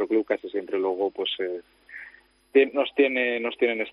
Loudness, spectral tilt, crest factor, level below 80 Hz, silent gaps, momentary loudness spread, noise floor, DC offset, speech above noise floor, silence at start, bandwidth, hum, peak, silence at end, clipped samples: -25 LUFS; -5.5 dB/octave; 18 dB; -72 dBFS; none; 19 LU; -50 dBFS; under 0.1%; 26 dB; 0 s; 5.2 kHz; none; -8 dBFS; 0 s; under 0.1%